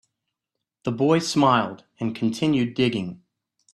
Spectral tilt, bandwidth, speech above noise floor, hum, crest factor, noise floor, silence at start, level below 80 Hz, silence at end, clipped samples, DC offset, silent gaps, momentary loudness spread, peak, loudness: -5.5 dB/octave; 12.5 kHz; 62 dB; none; 18 dB; -84 dBFS; 0.85 s; -62 dBFS; 0.6 s; under 0.1%; under 0.1%; none; 12 LU; -6 dBFS; -23 LUFS